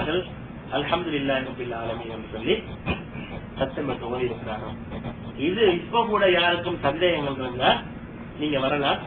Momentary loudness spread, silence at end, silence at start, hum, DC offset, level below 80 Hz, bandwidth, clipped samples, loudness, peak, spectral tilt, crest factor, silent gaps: 14 LU; 0 s; 0 s; none; under 0.1%; -46 dBFS; 4.4 kHz; under 0.1%; -25 LUFS; -6 dBFS; -10 dB/octave; 18 dB; none